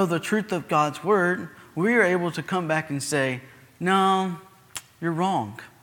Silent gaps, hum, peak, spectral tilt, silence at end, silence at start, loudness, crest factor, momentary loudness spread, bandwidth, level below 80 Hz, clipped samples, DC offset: none; none; -8 dBFS; -5 dB/octave; 0.15 s; 0 s; -24 LUFS; 18 dB; 15 LU; 18.5 kHz; -68 dBFS; under 0.1%; under 0.1%